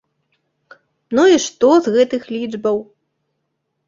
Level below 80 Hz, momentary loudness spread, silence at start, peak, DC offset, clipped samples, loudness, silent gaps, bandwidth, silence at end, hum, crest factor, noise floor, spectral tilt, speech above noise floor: -60 dBFS; 10 LU; 1.1 s; -2 dBFS; under 0.1%; under 0.1%; -16 LUFS; none; 7.8 kHz; 1.05 s; none; 16 dB; -73 dBFS; -4 dB/octave; 58 dB